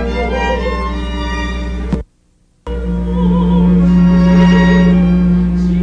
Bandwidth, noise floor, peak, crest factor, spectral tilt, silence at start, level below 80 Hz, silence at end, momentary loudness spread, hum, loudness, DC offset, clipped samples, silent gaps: 7 kHz; -54 dBFS; -2 dBFS; 10 dB; -8.5 dB/octave; 0 s; -20 dBFS; 0 s; 12 LU; none; -13 LUFS; under 0.1%; under 0.1%; none